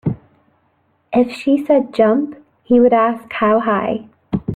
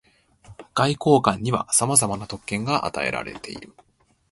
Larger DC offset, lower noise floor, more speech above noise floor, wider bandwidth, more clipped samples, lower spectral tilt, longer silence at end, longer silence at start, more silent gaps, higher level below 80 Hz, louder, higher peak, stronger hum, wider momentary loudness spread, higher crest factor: neither; first, -61 dBFS vs -51 dBFS; first, 47 dB vs 28 dB; second, 10 kHz vs 12 kHz; neither; first, -8 dB/octave vs -4 dB/octave; second, 0 s vs 0.65 s; second, 0.05 s vs 0.5 s; neither; about the same, -50 dBFS vs -52 dBFS; first, -16 LUFS vs -21 LUFS; about the same, -2 dBFS vs 0 dBFS; neither; second, 12 LU vs 16 LU; second, 14 dB vs 24 dB